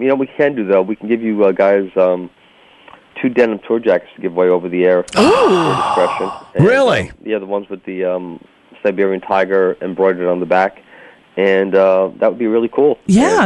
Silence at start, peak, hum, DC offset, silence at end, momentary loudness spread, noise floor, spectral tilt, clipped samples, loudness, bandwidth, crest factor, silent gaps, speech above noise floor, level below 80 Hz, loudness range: 0 s; -2 dBFS; none; under 0.1%; 0 s; 10 LU; -47 dBFS; -6 dB/octave; under 0.1%; -15 LUFS; 11.5 kHz; 14 dB; none; 33 dB; -50 dBFS; 4 LU